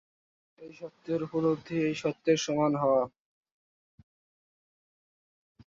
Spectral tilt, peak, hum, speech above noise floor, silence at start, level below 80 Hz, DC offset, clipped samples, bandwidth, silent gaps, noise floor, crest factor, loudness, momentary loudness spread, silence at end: -5.5 dB/octave; -12 dBFS; none; over 61 dB; 0.6 s; -70 dBFS; under 0.1%; under 0.1%; 7.8 kHz; none; under -90 dBFS; 20 dB; -29 LUFS; 18 LU; 2.6 s